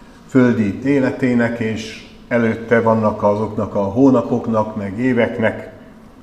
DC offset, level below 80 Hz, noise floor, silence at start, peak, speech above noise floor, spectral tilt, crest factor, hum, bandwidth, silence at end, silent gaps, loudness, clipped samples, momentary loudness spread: 0.1%; -48 dBFS; -40 dBFS; 0 s; 0 dBFS; 24 dB; -7.5 dB/octave; 16 dB; none; 9 kHz; 0 s; none; -17 LUFS; under 0.1%; 9 LU